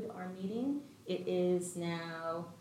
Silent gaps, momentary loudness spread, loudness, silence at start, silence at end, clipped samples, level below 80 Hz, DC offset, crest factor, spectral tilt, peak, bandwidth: none; 9 LU; -38 LUFS; 0 s; 0 s; under 0.1%; -80 dBFS; under 0.1%; 14 dB; -6 dB/octave; -22 dBFS; 15 kHz